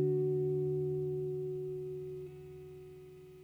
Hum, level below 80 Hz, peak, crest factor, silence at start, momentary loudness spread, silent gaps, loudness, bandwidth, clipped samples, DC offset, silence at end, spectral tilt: 60 Hz at -70 dBFS; -68 dBFS; -22 dBFS; 14 dB; 0 s; 19 LU; none; -36 LUFS; 4 kHz; under 0.1%; under 0.1%; 0 s; -11 dB/octave